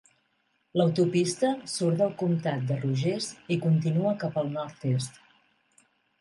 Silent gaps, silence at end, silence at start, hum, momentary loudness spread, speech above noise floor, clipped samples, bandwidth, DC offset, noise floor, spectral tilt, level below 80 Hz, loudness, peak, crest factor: none; 1.1 s; 0.75 s; none; 7 LU; 46 dB; under 0.1%; 11.5 kHz; under 0.1%; -72 dBFS; -6.5 dB/octave; -72 dBFS; -28 LUFS; -12 dBFS; 16 dB